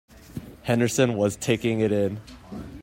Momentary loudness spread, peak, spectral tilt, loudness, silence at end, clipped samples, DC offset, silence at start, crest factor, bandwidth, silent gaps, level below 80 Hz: 18 LU; -6 dBFS; -5.5 dB/octave; -24 LUFS; 0 s; under 0.1%; under 0.1%; 0.3 s; 18 dB; 16 kHz; none; -52 dBFS